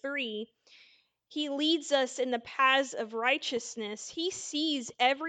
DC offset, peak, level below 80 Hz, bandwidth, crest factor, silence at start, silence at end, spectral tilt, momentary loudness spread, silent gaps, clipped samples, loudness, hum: under 0.1%; -12 dBFS; -80 dBFS; 9.4 kHz; 20 dB; 0.05 s; 0 s; -1.5 dB/octave; 12 LU; none; under 0.1%; -30 LUFS; none